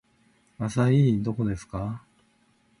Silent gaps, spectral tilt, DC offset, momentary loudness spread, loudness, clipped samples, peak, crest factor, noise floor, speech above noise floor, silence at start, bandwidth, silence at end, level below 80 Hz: none; -8 dB/octave; under 0.1%; 14 LU; -26 LUFS; under 0.1%; -10 dBFS; 16 dB; -65 dBFS; 40 dB; 0.6 s; 11 kHz; 0.8 s; -50 dBFS